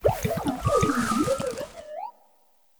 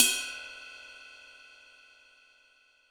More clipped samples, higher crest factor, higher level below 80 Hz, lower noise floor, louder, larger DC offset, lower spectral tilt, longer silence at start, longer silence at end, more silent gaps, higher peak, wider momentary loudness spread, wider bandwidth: neither; second, 18 dB vs 34 dB; first, -44 dBFS vs -72 dBFS; about the same, -63 dBFS vs -64 dBFS; first, -26 LUFS vs -32 LUFS; neither; first, -5.5 dB/octave vs 2.5 dB/octave; about the same, 0 s vs 0 s; second, 0.7 s vs 1.65 s; neither; second, -8 dBFS vs -2 dBFS; second, 15 LU vs 23 LU; about the same, over 20 kHz vs over 20 kHz